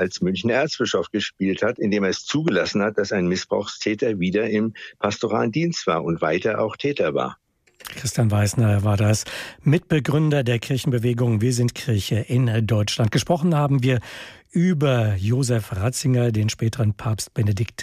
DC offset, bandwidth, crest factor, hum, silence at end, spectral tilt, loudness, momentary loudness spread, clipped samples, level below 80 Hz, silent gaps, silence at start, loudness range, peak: under 0.1%; 15 kHz; 14 dB; none; 0 s; -6 dB/octave; -22 LUFS; 6 LU; under 0.1%; -54 dBFS; none; 0 s; 2 LU; -8 dBFS